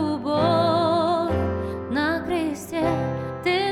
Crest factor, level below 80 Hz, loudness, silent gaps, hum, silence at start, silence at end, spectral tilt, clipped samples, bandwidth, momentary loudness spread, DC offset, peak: 14 dB; -46 dBFS; -23 LUFS; none; none; 0 s; 0 s; -6.5 dB/octave; under 0.1%; 15.5 kHz; 7 LU; under 0.1%; -8 dBFS